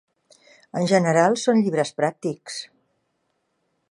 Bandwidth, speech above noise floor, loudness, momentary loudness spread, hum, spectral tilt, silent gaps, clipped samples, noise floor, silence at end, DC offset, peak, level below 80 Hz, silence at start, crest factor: 11.5 kHz; 52 dB; -21 LUFS; 15 LU; none; -5.5 dB/octave; none; under 0.1%; -73 dBFS; 1.25 s; under 0.1%; -4 dBFS; -72 dBFS; 0.75 s; 20 dB